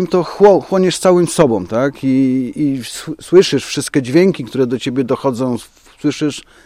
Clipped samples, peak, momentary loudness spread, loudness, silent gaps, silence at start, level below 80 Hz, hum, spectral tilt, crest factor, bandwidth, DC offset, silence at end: under 0.1%; 0 dBFS; 10 LU; -14 LUFS; none; 0 s; -50 dBFS; none; -5.5 dB/octave; 14 dB; 15.5 kHz; under 0.1%; 0.25 s